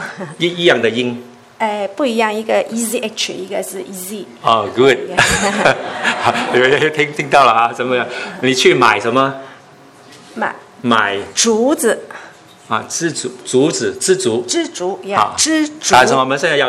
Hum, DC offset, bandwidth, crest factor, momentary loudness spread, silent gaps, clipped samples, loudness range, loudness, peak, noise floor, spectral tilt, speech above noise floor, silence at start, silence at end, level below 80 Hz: none; under 0.1%; 16 kHz; 16 dB; 12 LU; none; 0.1%; 5 LU; -15 LUFS; 0 dBFS; -42 dBFS; -3 dB/octave; 27 dB; 0 s; 0 s; -48 dBFS